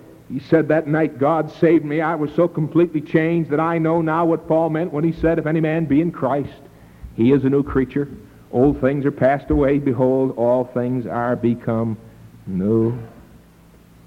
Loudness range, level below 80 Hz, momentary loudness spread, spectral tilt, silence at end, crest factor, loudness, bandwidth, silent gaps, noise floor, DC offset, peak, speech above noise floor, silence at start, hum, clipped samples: 2 LU; -42 dBFS; 7 LU; -9.5 dB/octave; 0.85 s; 16 dB; -19 LUFS; 6.2 kHz; none; -48 dBFS; under 0.1%; -4 dBFS; 30 dB; 0.1 s; none; under 0.1%